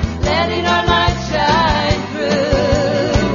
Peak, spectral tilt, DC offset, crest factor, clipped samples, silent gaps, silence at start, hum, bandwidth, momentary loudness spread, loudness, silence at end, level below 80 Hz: 0 dBFS; -5.5 dB/octave; under 0.1%; 14 dB; under 0.1%; none; 0 s; none; 7.4 kHz; 4 LU; -15 LUFS; 0 s; -26 dBFS